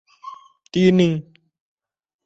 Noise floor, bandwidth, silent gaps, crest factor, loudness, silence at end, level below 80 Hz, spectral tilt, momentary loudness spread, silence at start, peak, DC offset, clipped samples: -41 dBFS; 7.8 kHz; none; 18 dB; -18 LUFS; 1.05 s; -58 dBFS; -7 dB/octave; 24 LU; 0.25 s; -4 dBFS; under 0.1%; under 0.1%